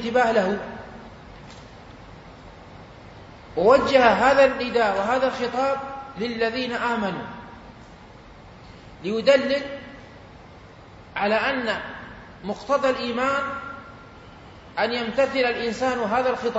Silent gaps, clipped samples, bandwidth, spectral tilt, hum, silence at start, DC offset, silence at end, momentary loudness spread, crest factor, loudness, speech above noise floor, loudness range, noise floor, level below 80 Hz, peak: none; under 0.1%; 8 kHz; -5 dB/octave; none; 0 s; under 0.1%; 0 s; 26 LU; 20 dB; -22 LUFS; 24 dB; 8 LU; -45 dBFS; -52 dBFS; -4 dBFS